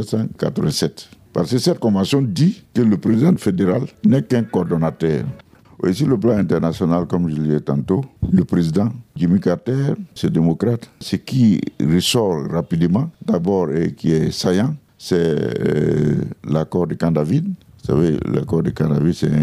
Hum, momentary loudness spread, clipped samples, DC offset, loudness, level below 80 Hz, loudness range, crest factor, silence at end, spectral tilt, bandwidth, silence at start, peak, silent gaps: none; 6 LU; under 0.1%; under 0.1%; -18 LUFS; -46 dBFS; 2 LU; 14 dB; 0 s; -7 dB/octave; 14.5 kHz; 0 s; -4 dBFS; none